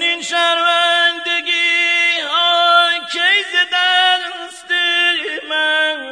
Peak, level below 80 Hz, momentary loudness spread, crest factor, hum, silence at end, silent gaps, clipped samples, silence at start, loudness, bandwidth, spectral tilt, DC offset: -2 dBFS; -70 dBFS; 6 LU; 14 dB; none; 0 s; none; under 0.1%; 0 s; -13 LUFS; 10.5 kHz; 1.5 dB/octave; under 0.1%